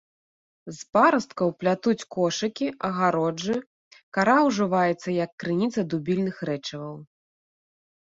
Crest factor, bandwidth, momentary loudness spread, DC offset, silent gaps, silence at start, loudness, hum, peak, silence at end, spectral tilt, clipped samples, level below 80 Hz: 20 dB; 7.8 kHz; 12 LU; under 0.1%; 3.66-3.91 s, 4.03-4.12 s, 5.32-5.38 s; 0.65 s; -25 LUFS; none; -6 dBFS; 1.15 s; -5.5 dB/octave; under 0.1%; -66 dBFS